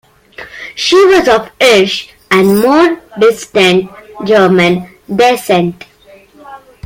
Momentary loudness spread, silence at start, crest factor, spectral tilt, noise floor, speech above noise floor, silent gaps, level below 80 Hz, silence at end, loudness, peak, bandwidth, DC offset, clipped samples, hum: 12 LU; 0.4 s; 10 dB; -4.5 dB/octave; -41 dBFS; 32 dB; none; -46 dBFS; 0.3 s; -10 LUFS; 0 dBFS; 16.5 kHz; under 0.1%; under 0.1%; none